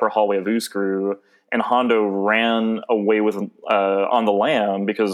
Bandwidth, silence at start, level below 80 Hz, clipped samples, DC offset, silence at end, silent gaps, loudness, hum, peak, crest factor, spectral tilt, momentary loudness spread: 15 kHz; 0 s; -82 dBFS; under 0.1%; under 0.1%; 0 s; none; -20 LUFS; none; -4 dBFS; 16 dB; -5.5 dB/octave; 6 LU